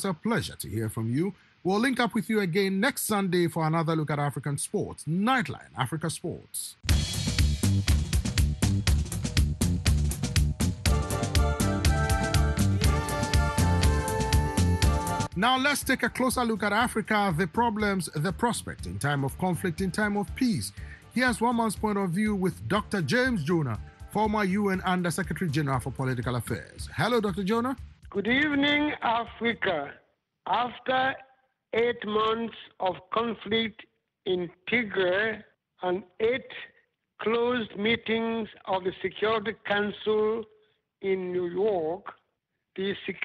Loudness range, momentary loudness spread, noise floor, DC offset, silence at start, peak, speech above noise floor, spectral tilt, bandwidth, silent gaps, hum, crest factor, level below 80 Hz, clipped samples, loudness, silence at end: 4 LU; 8 LU; -80 dBFS; under 0.1%; 0 s; -8 dBFS; 52 dB; -5 dB/octave; 12.5 kHz; none; none; 18 dB; -36 dBFS; under 0.1%; -27 LUFS; 0 s